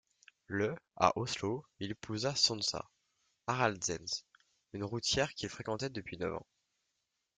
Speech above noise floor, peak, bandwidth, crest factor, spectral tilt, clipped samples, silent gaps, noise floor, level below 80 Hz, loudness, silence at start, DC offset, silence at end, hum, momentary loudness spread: 48 dB; -12 dBFS; 11.5 kHz; 26 dB; -3.5 dB/octave; under 0.1%; none; -84 dBFS; -66 dBFS; -35 LUFS; 0.5 s; under 0.1%; 1 s; none; 14 LU